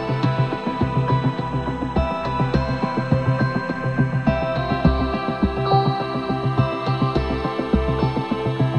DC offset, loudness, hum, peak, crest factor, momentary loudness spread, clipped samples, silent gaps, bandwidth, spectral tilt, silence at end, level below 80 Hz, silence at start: 0.1%; -22 LUFS; none; -4 dBFS; 18 dB; 4 LU; under 0.1%; none; 8.2 kHz; -8.5 dB/octave; 0 s; -32 dBFS; 0 s